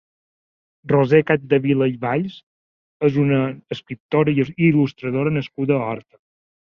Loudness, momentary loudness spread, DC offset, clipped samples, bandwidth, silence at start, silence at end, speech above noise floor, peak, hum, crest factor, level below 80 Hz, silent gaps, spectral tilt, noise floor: -19 LUFS; 12 LU; under 0.1%; under 0.1%; 6.6 kHz; 0.85 s; 0.75 s; over 71 dB; -2 dBFS; none; 18 dB; -58 dBFS; 2.43-3.00 s, 4.00-4.09 s; -9.5 dB/octave; under -90 dBFS